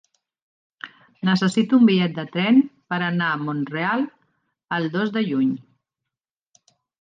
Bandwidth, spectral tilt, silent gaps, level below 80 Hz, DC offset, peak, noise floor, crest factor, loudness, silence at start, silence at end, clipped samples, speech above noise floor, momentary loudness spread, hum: 9.4 kHz; -6.5 dB/octave; none; -72 dBFS; under 0.1%; -6 dBFS; -87 dBFS; 16 dB; -21 LUFS; 0.85 s; 1.4 s; under 0.1%; 67 dB; 15 LU; none